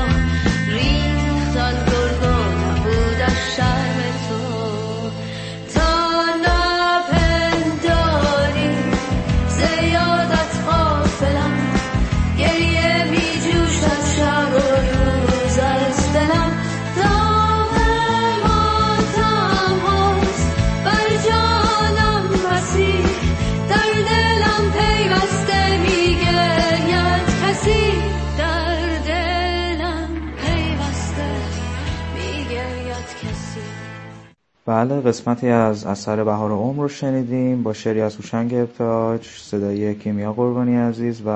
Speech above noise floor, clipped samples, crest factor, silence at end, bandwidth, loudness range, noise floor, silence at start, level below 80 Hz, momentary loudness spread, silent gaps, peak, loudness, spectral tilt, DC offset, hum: 27 dB; under 0.1%; 16 dB; 0 s; 8.8 kHz; 6 LU; -47 dBFS; 0 s; -26 dBFS; 8 LU; none; 0 dBFS; -18 LUFS; -5.5 dB/octave; under 0.1%; none